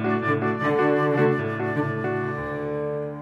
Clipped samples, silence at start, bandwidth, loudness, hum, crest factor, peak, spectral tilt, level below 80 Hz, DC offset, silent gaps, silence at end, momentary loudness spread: under 0.1%; 0 s; 8 kHz; -24 LUFS; none; 14 dB; -10 dBFS; -8.5 dB/octave; -56 dBFS; under 0.1%; none; 0 s; 8 LU